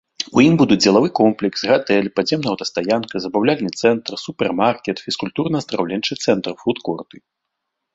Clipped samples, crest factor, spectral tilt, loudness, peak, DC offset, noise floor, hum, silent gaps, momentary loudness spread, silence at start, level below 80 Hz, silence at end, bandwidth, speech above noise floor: under 0.1%; 16 dB; -5 dB/octave; -18 LUFS; -2 dBFS; under 0.1%; -78 dBFS; none; none; 10 LU; 0.2 s; -56 dBFS; 0.95 s; 8 kHz; 60 dB